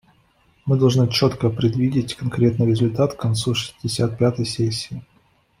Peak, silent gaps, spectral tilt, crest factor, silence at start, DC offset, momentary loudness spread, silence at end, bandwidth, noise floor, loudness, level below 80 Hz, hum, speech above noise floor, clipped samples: -4 dBFS; none; -6.5 dB/octave; 16 dB; 0.65 s; under 0.1%; 8 LU; 0.6 s; 15 kHz; -59 dBFS; -20 LUFS; -50 dBFS; none; 40 dB; under 0.1%